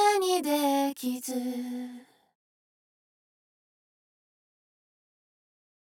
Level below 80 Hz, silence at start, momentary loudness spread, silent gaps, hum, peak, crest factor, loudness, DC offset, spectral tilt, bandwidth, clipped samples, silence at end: -90 dBFS; 0 s; 12 LU; none; none; -10 dBFS; 22 dB; -29 LUFS; under 0.1%; -1.5 dB/octave; 18.5 kHz; under 0.1%; 3.75 s